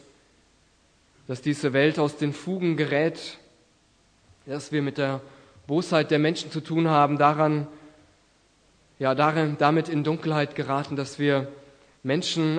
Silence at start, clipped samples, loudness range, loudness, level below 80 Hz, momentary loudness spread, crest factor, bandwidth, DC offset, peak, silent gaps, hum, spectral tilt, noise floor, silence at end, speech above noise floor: 1.3 s; under 0.1%; 5 LU; -25 LUFS; -68 dBFS; 12 LU; 22 dB; 9.8 kHz; under 0.1%; -4 dBFS; none; none; -6 dB/octave; -62 dBFS; 0 s; 38 dB